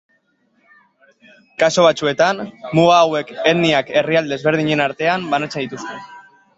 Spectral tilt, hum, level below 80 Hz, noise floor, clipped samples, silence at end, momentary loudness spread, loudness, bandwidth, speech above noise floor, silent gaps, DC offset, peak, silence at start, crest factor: -5 dB/octave; none; -60 dBFS; -62 dBFS; under 0.1%; 0.4 s; 13 LU; -16 LUFS; 8 kHz; 46 dB; none; under 0.1%; -2 dBFS; 1.6 s; 16 dB